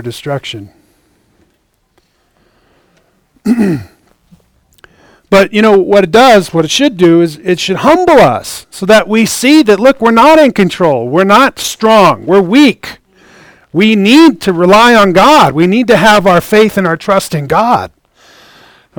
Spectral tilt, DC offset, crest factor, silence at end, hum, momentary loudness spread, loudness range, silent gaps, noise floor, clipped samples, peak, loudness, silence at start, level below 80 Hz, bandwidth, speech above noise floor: -5 dB/octave; under 0.1%; 8 dB; 1.1 s; none; 13 LU; 13 LU; none; -57 dBFS; 3%; 0 dBFS; -7 LUFS; 0 s; -42 dBFS; over 20 kHz; 50 dB